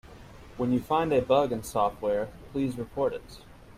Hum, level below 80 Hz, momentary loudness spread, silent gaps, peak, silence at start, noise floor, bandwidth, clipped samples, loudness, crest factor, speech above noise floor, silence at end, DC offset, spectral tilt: none; -52 dBFS; 11 LU; none; -10 dBFS; 0.05 s; -48 dBFS; 16 kHz; under 0.1%; -28 LUFS; 18 dB; 20 dB; 0.05 s; under 0.1%; -6.5 dB/octave